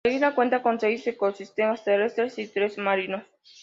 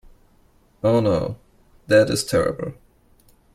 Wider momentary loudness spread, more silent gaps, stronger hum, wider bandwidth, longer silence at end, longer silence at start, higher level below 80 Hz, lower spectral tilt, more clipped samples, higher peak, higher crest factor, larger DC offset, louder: second, 6 LU vs 15 LU; neither; neither; second, 7.6 kHz vs 15.5 kHz; second, 0.4 s vs 0.8 s; second, 0.05 s vs 0.85 s; second, -68 dBFS vs -48 dBFS; about the same, -5.5 dB/octave vs -5.5 dB/octave; neither; second, -10 dBFS vs -4 dBFS; about the same, 16 dB vs 18 dB; neither; second, -25 LUFS vs -20 LUFS